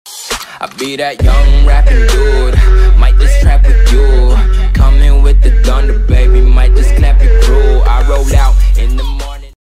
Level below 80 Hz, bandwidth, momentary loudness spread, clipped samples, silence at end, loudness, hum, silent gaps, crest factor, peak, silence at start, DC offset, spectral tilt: -6 dBFS; 11 kHz; 9 LU; under 0.1%; 0.15 s; -10 LUFS; none; none; 6 dB; 0 dBFS; 0.05 s; under 0.1%; -5.5 dB/octave